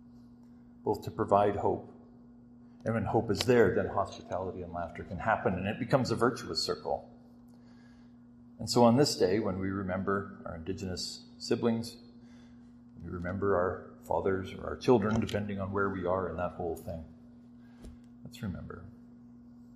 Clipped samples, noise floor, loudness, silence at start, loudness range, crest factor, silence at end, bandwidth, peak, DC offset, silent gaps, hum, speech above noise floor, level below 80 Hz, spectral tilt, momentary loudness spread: under 0.1%; -55 dBFS; -31 LUFS; 0 s; 6 LU; 24 dB; 0 s; 14.5 kHz; -8 dBFS; under 0.1%; none; none; 24 dB; -58 dBFS; -5.5 dB/octave; 17 LU